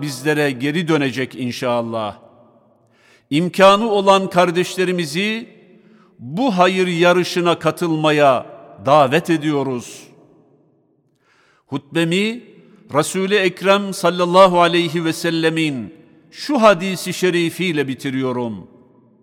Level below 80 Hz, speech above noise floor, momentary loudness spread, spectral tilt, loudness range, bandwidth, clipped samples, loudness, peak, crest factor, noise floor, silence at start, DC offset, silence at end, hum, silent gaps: -62 dBFS; 44 dB; 13 LU; -5 dB/octave; 6 LU; 17 kHz; under 0.1%; -17 LUFS; 0 dBFS; 18 dB; -61 dBFS; 0 s; under 0.1%; 0.6 s; none; none